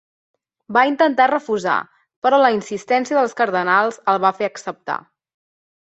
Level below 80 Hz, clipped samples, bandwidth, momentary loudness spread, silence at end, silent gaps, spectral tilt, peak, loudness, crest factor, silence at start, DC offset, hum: -68 dBFS; under 0.1%; 8.2 kHz; 11 LU; 1 s; 2.16-2.22 s; -4.5 dB/octave; -2 dBFS; -18 LUFS; 18 dB; 0.7 s; under 0.1%; none